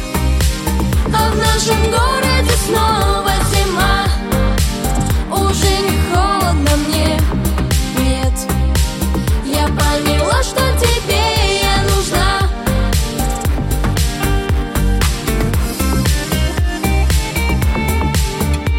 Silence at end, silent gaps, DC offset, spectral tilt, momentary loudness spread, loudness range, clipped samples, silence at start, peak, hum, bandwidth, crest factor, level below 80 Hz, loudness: 0 s; none; under 0.1%; -4.5 dB/octave; 4 LU; 3 LU; under 0.1%; 0 s; -2 dBFS; none; 17 kHz; 12 dB; -18 dBFS; -15 LUFS